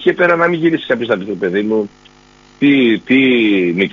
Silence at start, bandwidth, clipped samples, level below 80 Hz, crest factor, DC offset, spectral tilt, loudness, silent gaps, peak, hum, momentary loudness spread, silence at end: 0 s; 7.2 kHz; under 0.1%; -56 dBFS; 14 dB; under 0.1%; -4 dB/octave; -13 LUFS; none; 0 dBFS; none; 7 LU; 0 s